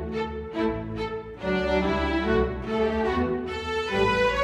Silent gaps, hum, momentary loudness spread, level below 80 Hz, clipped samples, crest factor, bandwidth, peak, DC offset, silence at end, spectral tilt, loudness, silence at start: none; none; 8 LU; -38 dBFS; under 0.1%; 16 dB; 11.5 kHz; -10 dBFS; under 0.1%; 0 s; -6.5 dB/octave; -26 LUFS; 0 s